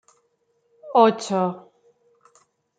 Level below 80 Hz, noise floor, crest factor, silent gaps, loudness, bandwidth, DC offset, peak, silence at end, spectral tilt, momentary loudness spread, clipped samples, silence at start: -80 dBFS; -69 dBFS; 22 dB; none; -20 LUFS; 9.4 kHz; under 0.1%; -2 dBFS; 1.2 s; -5.5 dB/octave; 11 LU; under 0.1%; 0.85 s